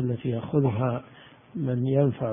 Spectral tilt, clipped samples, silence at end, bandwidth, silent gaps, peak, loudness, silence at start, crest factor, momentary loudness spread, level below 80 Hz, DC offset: -13 dB/octave; under 0.1%; 0 s; 3.7 kHz; none; -10 dBFS; -26 LUFS; 0 s; 16 dB; 10 LU; -56 dBFS; under 0.1%